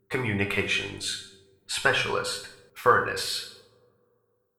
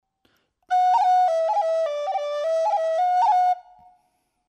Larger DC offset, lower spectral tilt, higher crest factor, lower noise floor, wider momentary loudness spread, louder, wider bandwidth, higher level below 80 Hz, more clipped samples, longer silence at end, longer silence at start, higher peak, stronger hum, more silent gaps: neither; first, -3 dB/octave vs 1 dB/octave; first, 22 dB vs 10 dB; about the same, -71 dBFS vs -70 dBFS; first, 13 LU vs 7 LU; second, -26 LUFS vs -22 LUFS; first, 17 kHz vs 9.4 kHz; first, -58 dBFS vs -80 dBFS; neither; about the same, 1 s vs 0.9 s; second, 0.1 s vs 0.7 s; first, -6 dBFS vs -12 dBFS; neither; neither